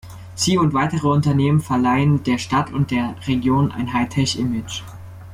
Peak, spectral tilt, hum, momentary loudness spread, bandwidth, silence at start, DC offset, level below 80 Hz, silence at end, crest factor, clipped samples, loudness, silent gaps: -6 dBFS; -5.5 dB/octave; none; 10 LU; 15 kHz; 0.05 s; under 0.1%; -46 dBFS; 0 s; 12 dB; under 0.1%; -19 LUFS; none